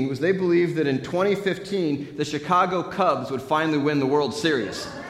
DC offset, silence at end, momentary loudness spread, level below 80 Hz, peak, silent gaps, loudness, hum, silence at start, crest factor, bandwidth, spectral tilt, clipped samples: under 0.1%; 0 s; 6 LU; -60 dBFS; -8 dBFS; none; -23 LUFS; none; 0 s; 16 dB; 14 kHz; -6 dB/octave; under 0.1%